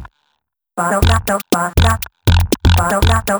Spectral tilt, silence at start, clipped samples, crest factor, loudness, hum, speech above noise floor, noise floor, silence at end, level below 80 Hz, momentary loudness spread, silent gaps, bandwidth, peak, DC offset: -5 dB/octave; 0 s; under 0.1%; 14 dB; -15 LUFS; none; 55 dB; -69 dBFS; 0 s; -22 dBFS; 4 LU; none; over 20 kHz; 0 dBFS; under 0.1%